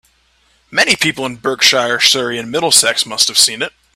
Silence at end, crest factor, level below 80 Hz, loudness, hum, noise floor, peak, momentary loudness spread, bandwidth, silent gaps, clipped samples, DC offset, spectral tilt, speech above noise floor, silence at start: 0.25 s; 16 dB; -54 dBFS; -12 LUFS; none; -56 dBFS; 0 dBFS; 10 LU; over 20 kHz; none; 0.1%; under 0.1%; -0.5 dB/octave; 42 dB; 0.7 s